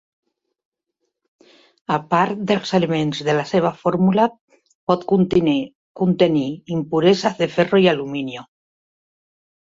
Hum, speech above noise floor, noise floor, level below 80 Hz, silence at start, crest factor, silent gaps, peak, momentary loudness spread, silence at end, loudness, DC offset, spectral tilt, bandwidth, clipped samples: none; 58 dB; -76 dBFS; -56 dBFS; 1.9 s; 18 dB; 4.41-4.48 s, 4.75-4.87 s, 5.75-5.95 s; -2 dBFS; 10 LU; 1.3 s; -19 LUFS; under 0.1%; -6.5 dB/octave; 7.8 kHz; under 0.1%